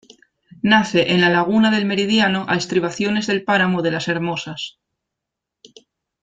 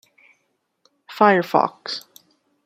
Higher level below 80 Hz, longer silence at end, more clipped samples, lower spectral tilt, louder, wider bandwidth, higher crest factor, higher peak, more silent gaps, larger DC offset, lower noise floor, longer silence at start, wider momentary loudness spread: first, -58 dBFS vs -72 dBFS; first, 1.55 s vs 0.65 s; neither; about the same, -5 dB/octave vs -5.5 dB/octave; about the same, -18 LUFS vs -19 LUFS; second, 9.2 kHz vs 16 kHz; about the same, 18 dB vs 22 dB; about the same, -2 dBFS vs -2 dBFS; neither; neither; first, -83 dBFS vs -71 dBFS; second, 0.65 s vs 1.1 s; second, 9 LU vs 16 LU